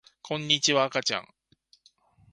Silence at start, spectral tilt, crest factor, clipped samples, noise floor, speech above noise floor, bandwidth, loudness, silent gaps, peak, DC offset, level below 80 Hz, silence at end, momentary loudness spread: 0.25 s; -2 dB/octave; 22 dB; under 0.1%; -65 dBFS; 38 dB; 11.5 kHz; -25 LUFS; none; -6 dBFS; under 0.1%; -70 dBFS; 1.1 s; 12 LU